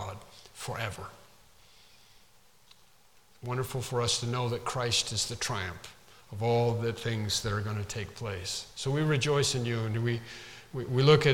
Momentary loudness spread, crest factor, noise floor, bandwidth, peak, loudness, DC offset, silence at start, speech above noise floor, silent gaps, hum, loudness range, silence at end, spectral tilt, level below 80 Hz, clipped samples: 17 LU; 22 dB; -63 dBFS; 17.5 kHz; -8 dBFS; -30 LUFS; under 0.1%; 0 s; 33 dB; none; none; 11 LU; 0 s; -4.5 dB/octave; -56 dBFS; under 0.1%